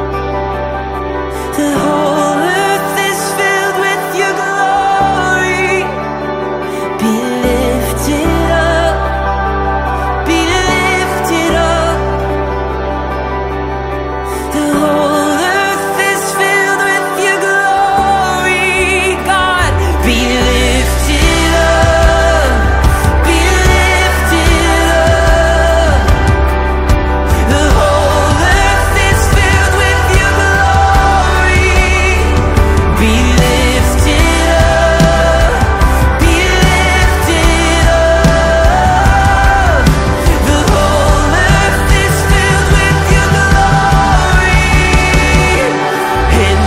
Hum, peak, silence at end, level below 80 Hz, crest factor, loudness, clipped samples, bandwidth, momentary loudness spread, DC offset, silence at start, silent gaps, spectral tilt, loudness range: none; 0 dBFS; 0 s; -16 dBFS; 10 dB; -11 LUFS; under 0.1%; 16 kHz; 6 LU; 0.1%; 0 s; none; -4.5 dB/octave; 4 LU